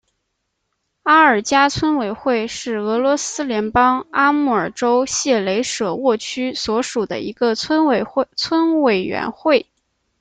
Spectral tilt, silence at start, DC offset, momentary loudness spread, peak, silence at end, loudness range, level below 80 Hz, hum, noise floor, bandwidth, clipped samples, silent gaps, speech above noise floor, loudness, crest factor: -3.5 dB/octave; 1.05 s; under 0.1%; 7 LU; -2 dBFS; 0.6 s; 2 LU; -52 dBFS; none; -73 dBFS; 9.4 kHz; under 0.1%; none; 56 dB; -18 LUFS; 16 dB